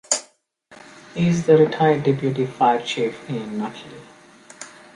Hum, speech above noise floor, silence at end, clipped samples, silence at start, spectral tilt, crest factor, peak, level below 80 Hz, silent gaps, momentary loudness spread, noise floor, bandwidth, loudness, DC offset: none; 35 dB; 0.3 s; under 0.1%; 0.1 s; -5 dB/octave; 20 dB; -2 dBFS; -60 dBFS; none; 23 LU; -55 dBFS; 11.5 kHz; -20 LUFS; under 0.1%